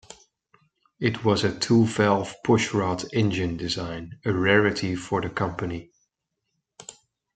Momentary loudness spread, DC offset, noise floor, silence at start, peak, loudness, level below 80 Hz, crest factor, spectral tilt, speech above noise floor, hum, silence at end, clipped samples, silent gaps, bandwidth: 13 LU; under 0.1%; -80 dBFS; 0.1 s; -4 dBFS; -24 LUFS; -56 dBFS; 22 dB; -5.5 dB/octave; 56 dB; none; 0.45 s; under 0.1%; none; 9.4 kHz